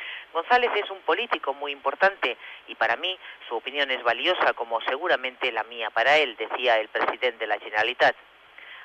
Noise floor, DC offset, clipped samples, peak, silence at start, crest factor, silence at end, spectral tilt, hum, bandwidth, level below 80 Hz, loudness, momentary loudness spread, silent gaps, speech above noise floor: -47 dBFS; under 0.1%; under 0.1%; -10 dBFS; 0 s; 16 dB; 0 s; -2.5 dB/octave; none; 9 kHz; -72 dBFS; -24 LUFS; 10 LU; none; 21 dB